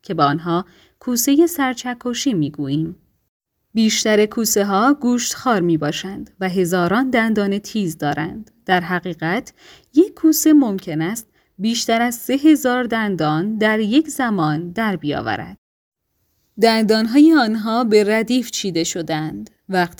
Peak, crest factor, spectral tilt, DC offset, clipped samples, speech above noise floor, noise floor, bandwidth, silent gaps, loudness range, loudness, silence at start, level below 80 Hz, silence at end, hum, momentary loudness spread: 0 dBFS; 18 dB; -4.5 dB/octave; under 0.1%; under 0.1%; 50 dB; -68 dBFS; over 20 kHz; 3.28-3.40 s, 15.58-15.92 s; 4 LU; -18 LUFS; 0.1 s; -56 dBFS; 0.1 s; none; 11 LU